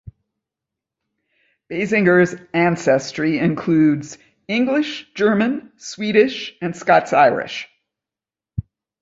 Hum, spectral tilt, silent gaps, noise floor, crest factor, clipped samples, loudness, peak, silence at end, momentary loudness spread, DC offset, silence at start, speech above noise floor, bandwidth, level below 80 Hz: none; -6 dB/octave; none; -89 dBFS; 18 dB; under 0.1%; -18 LUFS; -2 dBFS; 0.4 s; 16 LU; under 0.1%; 0.05 s; 72 dB; 8 kHz; -52 dBFS